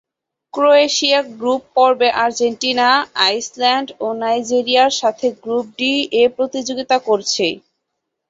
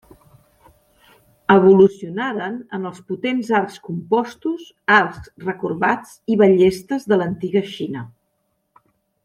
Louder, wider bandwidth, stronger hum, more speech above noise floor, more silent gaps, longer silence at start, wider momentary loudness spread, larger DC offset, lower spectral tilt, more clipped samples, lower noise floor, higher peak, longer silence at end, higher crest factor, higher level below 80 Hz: first, -16 LUFS vs -19 LUFS; second, 8 kHz vs 12 kHz; neither; first, 60 dB vs 52 dB; neither; second, 0.55 s vs 1.5 s; second, 8 LU vs 15 LU; neither; second, -1.5 dB/octave vs -7 dB/octave; neither; first, -76 dBFS vs -70 dBFS; about the same, -2 dBFS vs -2 dBFS; second, 0.7 s vs 1.15 s; about the same, 16 dB vs 18 dB; second, -64 dBFS vs -58 dBFS